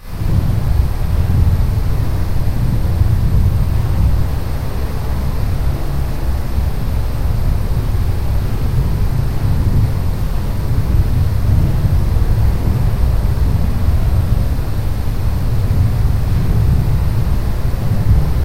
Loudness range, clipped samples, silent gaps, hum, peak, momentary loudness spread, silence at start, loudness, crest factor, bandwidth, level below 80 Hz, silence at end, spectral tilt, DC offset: 3 LU; under 0.1%; none; none; 0 dBFS; 5 LU; 0 s; -17 LUFS; 14 dB; 16 kHz; -16 dBFS; 0 s; -7.5 dB/octave; 8%